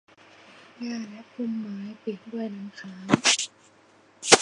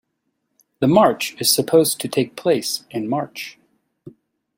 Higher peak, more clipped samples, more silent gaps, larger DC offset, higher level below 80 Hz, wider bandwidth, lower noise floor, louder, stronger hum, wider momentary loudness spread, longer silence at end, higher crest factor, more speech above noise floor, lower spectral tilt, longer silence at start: about the same, 0 dBFS vs -2 dBFS; neither; neither; neither; second, -68 dBFS vs -60 dBFS; second, 11.5 kHz vs 16.5 kHz; second, -58 dBFS vs -73 dBFS; second, -27 LUFS vs -19 LUFS; neither; first, 18 LU vs 11 LU; second, 0 s vs 0.5 s; first, 28 dB vs 20 dB; second, 29 dB vs 55 dB; second, -2 dB/octave vs -4 dB/octave; about the same, 0.8 s vs 0.8 s